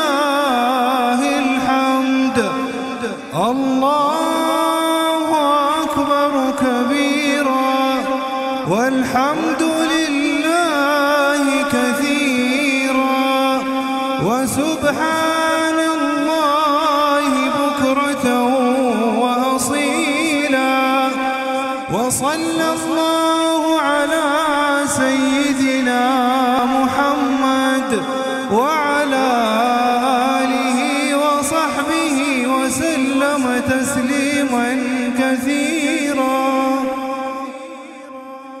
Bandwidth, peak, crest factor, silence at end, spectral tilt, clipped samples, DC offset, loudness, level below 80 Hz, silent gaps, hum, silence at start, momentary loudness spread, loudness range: 16 kHz; -2 dBFS; 14 dB; 0 s; -3.5 dB/octave; under 0.1%; under 0.1%; -16 LUFS; -54 dBFS; none; none; 0 s; 4 LU; 2 LU